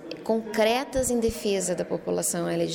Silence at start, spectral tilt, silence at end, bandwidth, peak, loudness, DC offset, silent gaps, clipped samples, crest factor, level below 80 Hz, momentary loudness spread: 0 s; -4 dB/octave; 0 s; 19 kHz; -12 dBFS; -26 LUFS; under 0.1%; none; under 0.1%; 14 dB; -48 dBFS; 5 LU